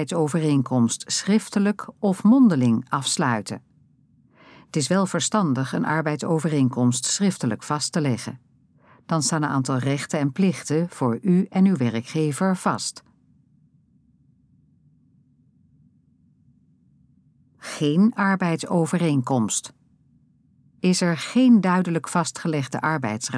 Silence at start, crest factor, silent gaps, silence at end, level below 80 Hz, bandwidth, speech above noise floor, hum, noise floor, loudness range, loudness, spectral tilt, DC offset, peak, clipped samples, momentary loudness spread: 0 s; 16 dB; none; 0 s; -72 dBFS; 11 kHz; 38 dB; none; -60 dBFS; 5 LU; -22 LUFS; -5 dB/octave; under 0.1%; -6 dBFS; under 0.1%; 8 LU